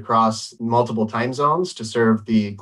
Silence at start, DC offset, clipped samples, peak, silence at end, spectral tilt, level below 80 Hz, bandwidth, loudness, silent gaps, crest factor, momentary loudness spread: 0 s; under 0.1%; under 0.1%; -4 dBFS; 0 s; -6 dB/octave; -60 dBFS; 11.5 kHz; -20 LUFS; none; 14 dB; 5 LU